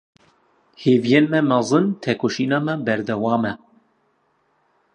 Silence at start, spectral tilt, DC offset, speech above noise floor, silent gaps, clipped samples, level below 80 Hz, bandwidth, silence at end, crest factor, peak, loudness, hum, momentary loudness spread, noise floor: 0.8 s; -6 dB/octave; under 0.1%; 46 dB; none; under 0.1%; -64 dBFS; 10 kHz; 1.4 s; 20 dB; -2 dBFS; -20 LUFS; none; 7 LU; -65 dBFS